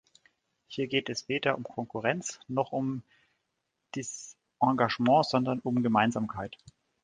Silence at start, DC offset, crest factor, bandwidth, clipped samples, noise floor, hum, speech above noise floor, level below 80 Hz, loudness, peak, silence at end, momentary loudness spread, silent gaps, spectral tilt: 0.7 s; under 0.1%; 22 dB; 9.8 kHz; under 0.1%; -81 dBFS; none; 52 dB; -66 dBFS; -29 LUFS; -8 dBFS; 0.5 s; 16 LU; none; -5 dB/octave